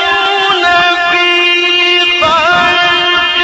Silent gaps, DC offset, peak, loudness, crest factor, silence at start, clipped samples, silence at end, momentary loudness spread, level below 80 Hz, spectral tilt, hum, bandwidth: none; under 0.1%; 0 dBFS; -8 LUFS; 10 dB; 0 s; under 0.1%; 0 s; 2 LU; -44 dBFS; -2 dB/octave; none; 8.2 kHz